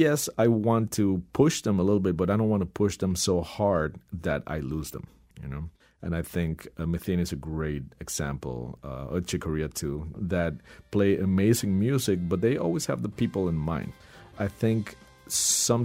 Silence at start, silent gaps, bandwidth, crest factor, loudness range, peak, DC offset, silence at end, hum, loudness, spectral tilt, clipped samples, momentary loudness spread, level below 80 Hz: 0 s; none; 16 kHz; 18 dB; 7 LU; -8 dBFS; under 0.1%; 0 s; none; -27 LUFS; -5 dB/octave; under 0.1%; 13 LU; -46 dBFS